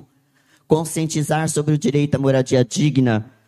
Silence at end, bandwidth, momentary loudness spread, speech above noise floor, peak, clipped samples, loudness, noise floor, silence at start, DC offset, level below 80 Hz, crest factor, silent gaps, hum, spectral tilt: 0.25 s; 13.5 kHz; 4 LU; 41 dB; -2 dBFS; under 0.1%; -19 LUFS; -59 dBFS; 0.7 s; under 0.1%; -54 dBFS; 16 dB; none; none; -6 dB/octave